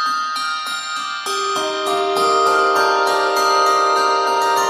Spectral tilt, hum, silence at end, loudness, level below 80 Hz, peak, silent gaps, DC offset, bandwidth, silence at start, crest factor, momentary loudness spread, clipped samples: -1 dB/octave; none; 0 s; -17 LUFS; -70 dBFS; -4 dBFS; none; under 0.1%; 15.5 kHz; 0 s; 12 dB; 8 LU; under 0.1%